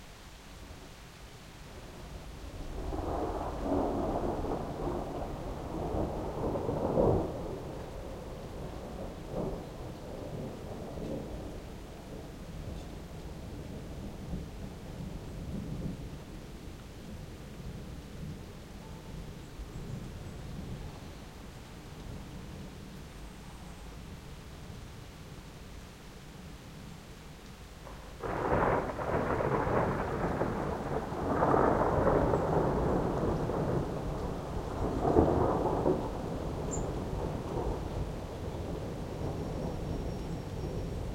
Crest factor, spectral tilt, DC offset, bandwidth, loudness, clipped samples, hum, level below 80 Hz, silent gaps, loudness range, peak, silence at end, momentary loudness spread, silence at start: 26 dB; -7 dB/octave; under 0.1%; 16 kHz; -35 LUFS; under 0.1%; none; -44 dBFS; none; 17 LU; -8 dBFS; 0 s; 19 LU; 0 s